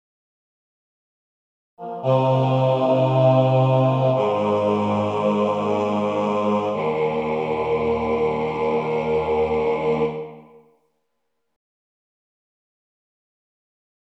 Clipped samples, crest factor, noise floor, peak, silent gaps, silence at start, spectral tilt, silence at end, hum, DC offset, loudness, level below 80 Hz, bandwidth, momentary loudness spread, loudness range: under 0.1%; 16 dB; -77 dBFS; -6 dBFS; none; 1.8 s; -8.5 dB/octave; 3.7 s; none; under 0.1%; -21 LUFS; -52 dBFS; 7.6 kHz; 6 LU; 7 LU